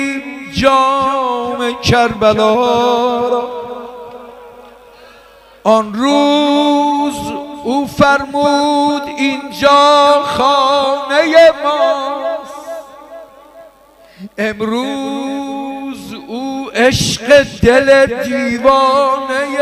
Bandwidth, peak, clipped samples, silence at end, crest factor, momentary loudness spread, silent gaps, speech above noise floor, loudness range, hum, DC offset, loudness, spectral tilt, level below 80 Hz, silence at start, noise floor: 15.5 kHz; 0 dBFS; under 0.1%; 0 s; 14 dB; 15 LU; none; 32 dB; 11 LU; none; under 0.1%; -12 LUFS; -4.5 dB/octave; -40 dBFS; 0 s; -44 dBFS